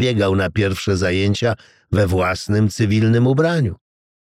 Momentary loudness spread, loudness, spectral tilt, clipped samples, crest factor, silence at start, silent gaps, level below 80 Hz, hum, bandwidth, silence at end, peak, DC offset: 6 LU; -18 LUFS; -6.5 dB/octave; under 0.1%; 14 dB; 0 s; none; -44 dBFS; none; 14.5 kHz; 0.55 s; -4 dBFS; under 0.1%